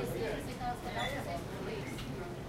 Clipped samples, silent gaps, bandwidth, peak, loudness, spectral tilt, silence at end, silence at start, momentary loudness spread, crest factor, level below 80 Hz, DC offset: under 0.1%; none; 16 kHz; -24 dBFS; -39 LUFS; -5 dB/octave; 0 s; 0 s; 4 LU; 14 dB; -50 dBFS; under 0.1%